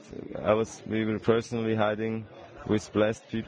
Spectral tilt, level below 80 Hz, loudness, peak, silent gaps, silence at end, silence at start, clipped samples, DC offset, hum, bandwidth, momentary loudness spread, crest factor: -6.5 dB/octave; -58 dBFS; -28 LUFS; -10 dBFS; none; 0 s; 0 s; under 0.1%; under 0.1%; none; 10 kHz; 11 LU; 18 dB